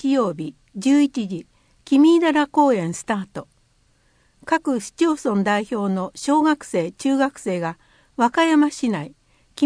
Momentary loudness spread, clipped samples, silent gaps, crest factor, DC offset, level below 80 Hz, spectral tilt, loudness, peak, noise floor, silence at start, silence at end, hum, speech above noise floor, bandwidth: 14 LU; under 0.1%; none; 16 dB; under 0.1%; -62 dBFS; -5.5 dB/octave; -20 LUFS; -4 dBFS; -61 dBFS; 0 s; 0 s; none; 41 dB; 10.5 kHz